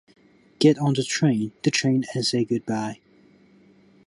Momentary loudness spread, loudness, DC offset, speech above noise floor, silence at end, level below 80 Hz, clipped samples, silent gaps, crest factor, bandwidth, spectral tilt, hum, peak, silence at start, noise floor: 9 LU; -23 LUFS; under 0.1%; 33 dB; 1.1 s; -66 dBFS; under 0.1%; none; 18 dB; 11.5 kHz; -5 dB/octave; none; -6 dBFS; 0.6 s; -55 dBFS